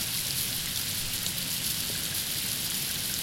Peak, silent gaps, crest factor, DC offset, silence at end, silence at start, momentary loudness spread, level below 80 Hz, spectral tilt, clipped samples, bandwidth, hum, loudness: -12 dBFS; none; 20 dB; under 0.1%; 0 s; 0 s; 1 LU; -52 dBFS; -1 dB/octave; under 0.1%; 17 kHz; none; -28 LUFS